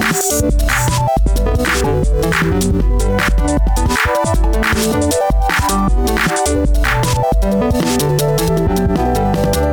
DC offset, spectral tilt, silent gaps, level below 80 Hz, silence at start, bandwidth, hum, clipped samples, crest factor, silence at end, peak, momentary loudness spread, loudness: under 0.1%; -5 dB/octave; none; -18 dBFS; 0 s; over 20 kHz; none; under 0.1%; 12 dB; 0 s; -2 dBFS; 1 LU; -15 LUFS